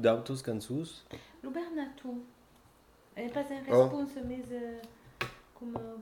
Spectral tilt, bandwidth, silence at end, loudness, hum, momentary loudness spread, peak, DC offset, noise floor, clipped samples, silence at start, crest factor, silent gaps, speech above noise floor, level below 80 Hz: -6.5 dB/octave; 18 kHz; 0 s; -35 LUFS; none; 21 LU; -12 dBFS; under 0.1%; -62 dBFS; under 0.1%; 0 s; 24 dB; none; 29 dB; -64 dBFS